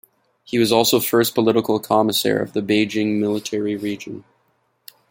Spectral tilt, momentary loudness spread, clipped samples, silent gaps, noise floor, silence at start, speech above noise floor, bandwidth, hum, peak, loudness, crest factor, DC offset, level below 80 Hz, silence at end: -4 dB/octave; 10 LU; under 0.1%; none; -65 dBFS; 0.5 s; 47 dB; 17 kHz; none; -2 dBFS; -19 LUFS; 18 dB; under 0.1%; -62 dBFS; 0.9 s